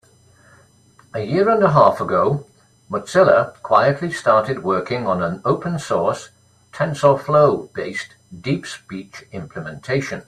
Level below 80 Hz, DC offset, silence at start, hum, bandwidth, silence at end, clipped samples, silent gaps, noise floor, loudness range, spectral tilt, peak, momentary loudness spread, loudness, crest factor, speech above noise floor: -56 dBFS; under 0.1%; 1.15 s; none; 12.5 kHz; 0.05 s; under 0.1%; none; -52 dBFS; 4 LU; -6.5 dB/octave; 0 dBFS; 17 LU; -18 LUFS; 18 dB; 34 dB